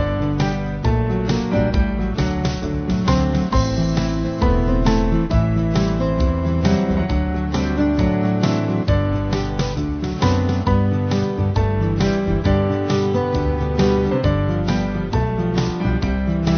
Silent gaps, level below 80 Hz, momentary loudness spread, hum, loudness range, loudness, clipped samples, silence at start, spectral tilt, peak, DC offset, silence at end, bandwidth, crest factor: none; -26 dBFS; 4 LU; none; 1 LU; -19 LUFS; under 0.1%; 0 s; -7.5 dB/octave; -2 dBFS; under 0.1%; 0 s; 6.6 kHz; 16 dB